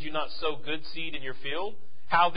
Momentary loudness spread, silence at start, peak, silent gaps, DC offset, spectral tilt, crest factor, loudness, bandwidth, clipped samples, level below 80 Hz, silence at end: 8 LU; 0 s; -8 dBFS; none; 4%; -8 dB/octave; 22 dB; -32 LUFS; 5.2 kHz; under 0.1%; -58 dBFS; 0 s